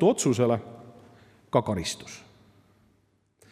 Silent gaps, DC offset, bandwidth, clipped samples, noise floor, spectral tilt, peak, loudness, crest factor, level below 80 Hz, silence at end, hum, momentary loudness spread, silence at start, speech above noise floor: none; under 0.1%; 15.5 kHz; under 0.1%; -68 dBFS; -5.5 dB/octave; -8 dBFS; -27 LUFS; 22 dB; -62 dBFS; 1.3 s; none; 23 LU; 0 s; 43 dB